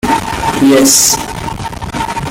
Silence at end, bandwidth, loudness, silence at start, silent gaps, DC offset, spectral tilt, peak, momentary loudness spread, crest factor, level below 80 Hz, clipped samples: 0 s; 17 kHz; -10 LUFS; 0.05 s; none; under 0.1%; -3 dB/octave; 0 dBFS; 15 LU; 12 dB; -32 dBFS; under 0.1%